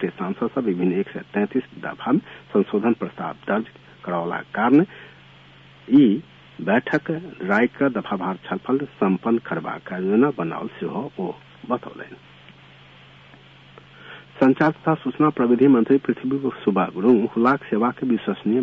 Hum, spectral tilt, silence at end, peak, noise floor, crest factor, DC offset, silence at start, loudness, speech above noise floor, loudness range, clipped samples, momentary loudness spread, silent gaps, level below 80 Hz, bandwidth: none; -9 dB/octave; 0 s; -6 dBFS; -48 dBFS; 16 dB; under 0.1%; 0 s; -22 LUFS; 27 dB; 7 LU; under 0.1%; 13 LU; none; -64 dBFS; 5.4 kHz